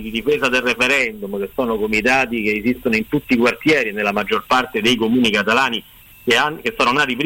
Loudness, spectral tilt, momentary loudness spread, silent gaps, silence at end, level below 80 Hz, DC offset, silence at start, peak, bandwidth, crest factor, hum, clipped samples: -17 LUFS; -4 dB/octave; 6 LU; none; 0 s; -46 dBFS; under 0.1%; 0 s; -6 dBFS; 16.5 kHz; 12 dB; none; under 0.1%